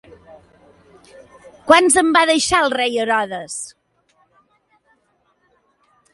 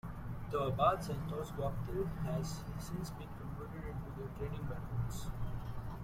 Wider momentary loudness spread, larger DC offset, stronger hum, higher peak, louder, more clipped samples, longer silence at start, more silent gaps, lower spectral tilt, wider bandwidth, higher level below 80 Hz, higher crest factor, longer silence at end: first, 17 LU vs 13 LU; neither; neither; first, 0 dBFS vs -18 dBFS; first, -15 LUFS vs -40 LUFS; neither; first, 1.65 s vs 0.05 s; neither; second, -1.5 dB/octave vs -6.5 dB/octave; second, 11.5 kHz vs 16.5 kHz; second, -54 dBFS vs -48 dBFS; about the same, 20 dB vs 20 dB; first, 2.45 s vs 0 s